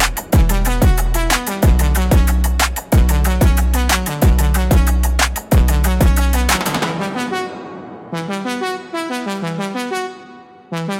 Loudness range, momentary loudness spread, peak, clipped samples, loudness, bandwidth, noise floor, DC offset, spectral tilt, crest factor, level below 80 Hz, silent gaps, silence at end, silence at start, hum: 8 LU; 10 LU; -4 dBFS; under 0.1%; -17 LUFS; 17 kHz; -39 dBFS; under 0.1%; -5 dB/octave; 12 dB; -18 dBFS; none; 0 s; 0 s; none